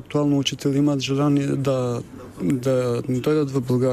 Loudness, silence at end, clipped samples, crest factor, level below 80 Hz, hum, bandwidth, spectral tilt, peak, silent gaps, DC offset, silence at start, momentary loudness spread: -22 LUFS; 0 s; under 0.1%; 12 dB; -56 dBFS; none; 14 kHz; -6.5 dB/octave; -8 dBFS; none; under 0.1%; 0 s; 6 LU